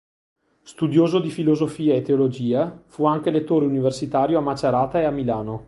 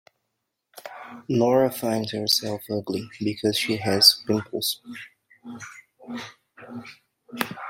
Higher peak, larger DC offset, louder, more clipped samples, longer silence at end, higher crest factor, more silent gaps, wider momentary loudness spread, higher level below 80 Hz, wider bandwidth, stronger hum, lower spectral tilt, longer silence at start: about the same, -4 dBFS vs -2 dBFS; neither; about the same, -21 LUFS vs -22 LUFS; neither; about the same, 0.05 s vs 0 s; second, 16 dB vs 24 dB; neither; second, 4 LU vs 25 LU; first, -54 dBFS vs -66 dBFS; second, 11.5 kHz vs 16.5 kHz; neither; first, -7.5 dB/octave vs -3.5 dB/octave; about the same, 0.7 s vs 0.75 s